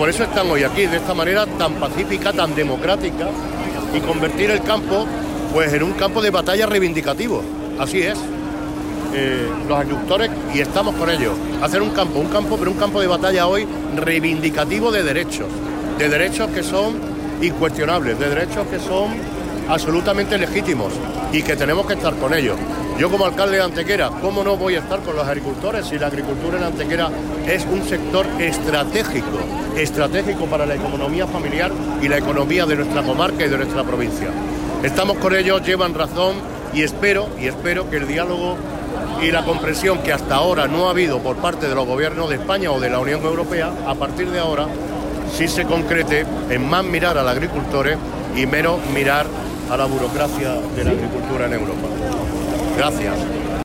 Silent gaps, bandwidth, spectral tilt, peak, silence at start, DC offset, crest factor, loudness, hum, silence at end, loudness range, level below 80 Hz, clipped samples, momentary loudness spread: none; 16 kHz; -5 dB/octave; -6 dBFS; 0 s; under 0.1%; 14 dB; -19 LUFS; none; 0 s; 2 LU; -36 dBFS; under 0.1%; 7 LU